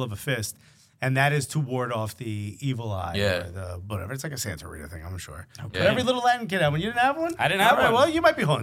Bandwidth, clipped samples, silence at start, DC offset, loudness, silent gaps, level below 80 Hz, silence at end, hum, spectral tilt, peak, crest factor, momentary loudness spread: 16.5 kHz; under 0.1%; 0 s; under 0.1%; -24 LUFS; none; -52 dBFS; 0 s; none; -5 dB/octave; -4 dBFS; 22 dB; 18 LU